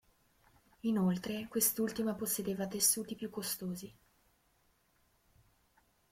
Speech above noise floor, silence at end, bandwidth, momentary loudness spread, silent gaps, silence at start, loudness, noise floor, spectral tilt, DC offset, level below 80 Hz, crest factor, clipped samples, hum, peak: 38 dB; 2.2 s; 16.5 kHz; 12 LU; none; 0.85 s; -34 LUFS; -73 dBFS; -4 dB/octave; under 0.1%; -70 dBFS; 24 dB; under 0.1%; none; -14 dBFS